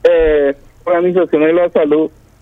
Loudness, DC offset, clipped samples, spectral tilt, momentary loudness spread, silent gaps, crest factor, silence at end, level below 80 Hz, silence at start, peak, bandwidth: -13 LUFS; under 0.1%; under 0.1%; -8 dB/octave; 7 LU; none; 12 dB; 0.35 s; -34 dBFS; 0.05 s; 0 dBFS; 5 kHz